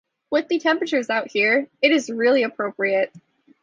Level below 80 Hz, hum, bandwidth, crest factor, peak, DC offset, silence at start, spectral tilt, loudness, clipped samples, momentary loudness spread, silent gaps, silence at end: -72 dBFS; none; 9.6 kHz; 16 dB; -4 dBFS; under 0.1%; 0.3 s; -3.5 dB/octave; -21 LUFS; under 0.1%; 6 LU; none; 0.45 s